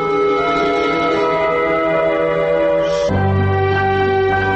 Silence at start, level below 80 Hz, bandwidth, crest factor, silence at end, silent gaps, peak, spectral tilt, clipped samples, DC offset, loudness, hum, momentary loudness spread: 0 s; -40 dBFS; 8.2 kHz; 10 dB; 0 s; none; -6 dBFS; -7 dB/octave; under 0.1%; under 0.1%; -16 LUFS; none; 1 LU